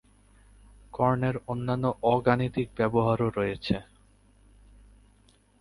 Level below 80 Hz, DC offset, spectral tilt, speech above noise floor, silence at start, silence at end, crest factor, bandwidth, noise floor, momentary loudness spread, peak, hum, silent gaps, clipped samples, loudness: -52 dBFS; under 0.1%; -8.5 dB/octave; 35 dB; 0.95 s; 1.8 s; 20 dB; 11.5 kHz; -61 dBFS; 7 LU; -8 dBFS; 50 Hz at -50 dBFS; none; under 0.1%; -27 LUFS